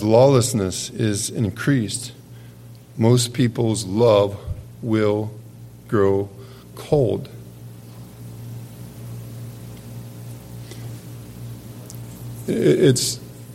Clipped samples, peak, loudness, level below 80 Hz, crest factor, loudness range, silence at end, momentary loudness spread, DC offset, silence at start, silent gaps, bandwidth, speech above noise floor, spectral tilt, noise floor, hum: under 0.1%; -2 dBFS; -20 LUFS; -50 dBFS; 20 dB; 16 LU; 0 s; 24 LU; under 0.1%; 0 s; none; 16.5 kHz; 23 dB; -5.5 dB/octave; -42 dBFS; none